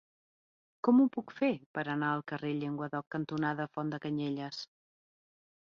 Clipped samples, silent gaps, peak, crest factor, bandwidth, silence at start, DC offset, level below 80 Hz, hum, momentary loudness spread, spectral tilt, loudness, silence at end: under 0.1%; 1.66-1.74 s, 3.07-3.11 s; -16 dBFS; 18 dB; 7 kHz; 0.85 s; under 0.1%; -78 dBFS; none; 11 LU; -5.5 dB/octave; -33 LUFS; 1.1 s